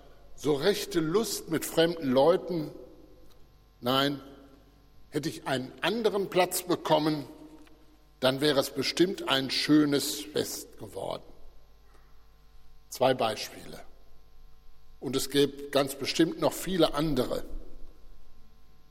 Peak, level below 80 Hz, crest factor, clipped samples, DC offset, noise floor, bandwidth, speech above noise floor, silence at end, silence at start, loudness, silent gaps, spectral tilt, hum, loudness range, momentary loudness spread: -10 dBFS; -50 dBFS; 20 dB; under 0.1%; under 0.1%; -56 dBFS; 16.5 kHz; 28 dB; 0.05 s; 0.1 s; -28 LUFS; none; -4 dB/octave; none; 7 LU; 14 LU